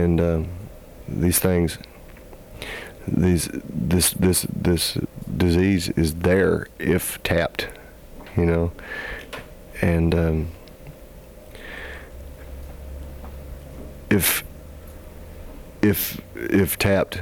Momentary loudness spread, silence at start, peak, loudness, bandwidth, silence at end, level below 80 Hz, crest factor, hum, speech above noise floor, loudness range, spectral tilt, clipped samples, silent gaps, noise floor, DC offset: 22 LU; 0 s; -6 dBFS; -22 LUFS; 19.5 kHz; 0 s; -38 dBFS; 18 dB; none; 22 dB; 7 LU; -5 dB/octave; under 0.1%; none; -42 dBFS; under 0.1%